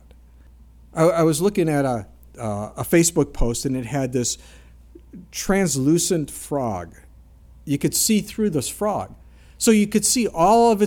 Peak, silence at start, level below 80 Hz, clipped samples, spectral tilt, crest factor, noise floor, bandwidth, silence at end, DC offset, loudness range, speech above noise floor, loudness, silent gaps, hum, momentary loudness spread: -4 dBFS; 0.95 s; -38 dBFS; under 0.1%; -4.5 dB/octave; 18 dB; -48 dBFS; 18 kHz; 0 s; under 0.1%; 3 LU; 27 dB; -21 LUFS; none; none; 12 LU